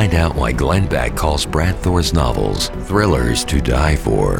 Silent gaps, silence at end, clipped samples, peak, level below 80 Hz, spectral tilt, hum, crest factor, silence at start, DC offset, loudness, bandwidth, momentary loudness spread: none; 0 s; under 0.1%; 0 dBFS; -22 dBFS; -5.5 dB/octave; none; 16 dB; 0 s; 0.5%; -17 LUFS; 18 kHz; 3 LU